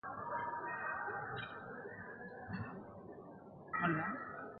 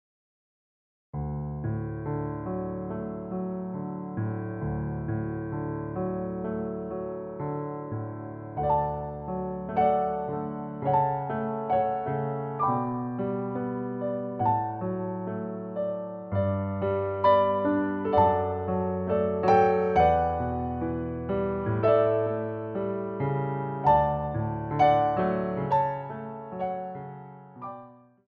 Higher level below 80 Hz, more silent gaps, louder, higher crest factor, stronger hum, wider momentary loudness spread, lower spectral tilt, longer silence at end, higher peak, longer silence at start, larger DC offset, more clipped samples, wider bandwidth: second, -70 dBFS vs -50 dBFS; neither; second, -43 LUFS vs -28 LUFS; about the same, 20 dB vs 18 dB; neither; first, 16 LU vs 12 LU; second, -4.5 dB/octave vs -7.5 dB/octave; second, 0 s vs 0.3 s; second, -22 dBFS vs -10 dBFS; second, 0.05 s vs 1.15 s; neither; neither; second, 4.8 kHz vs 6.6 kHz